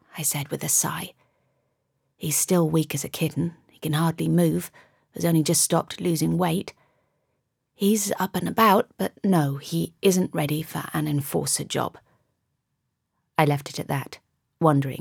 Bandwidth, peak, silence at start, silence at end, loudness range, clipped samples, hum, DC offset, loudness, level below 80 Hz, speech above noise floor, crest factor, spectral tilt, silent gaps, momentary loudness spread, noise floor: 19.5 kHz; -4 dBFS; 0.15 s; 0 s; 4 LU; under 0.1%; none; under 0.1%; -24 LUFS; -62 dBFS; 54 dB; 22 dB; -4.5 dB/octave; none; 10 LU; -78 dBFS